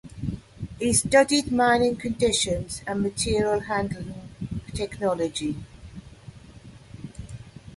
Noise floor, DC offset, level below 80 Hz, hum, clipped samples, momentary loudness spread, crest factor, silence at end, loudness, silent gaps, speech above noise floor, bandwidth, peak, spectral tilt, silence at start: -46 dBFS; under 0.1%; -46 dBFS; none; under 0.1%; 23 LU; 22 dB; 0 s; -24 LUFS; none; 23 dB; 12 kHz; -4 dBFS; -4 dB/octave; 0.05 s